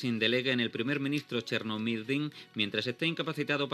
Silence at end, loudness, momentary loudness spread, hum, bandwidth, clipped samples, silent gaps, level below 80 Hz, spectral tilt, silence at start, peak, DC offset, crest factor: 0 s; -31 LUFS; 6 LU; none; 14 kHz; under 0.1%; none; -84 dBFS; -5.5 dB/octave; 0 s; -14 dBFS; under 0.1%; 18 dB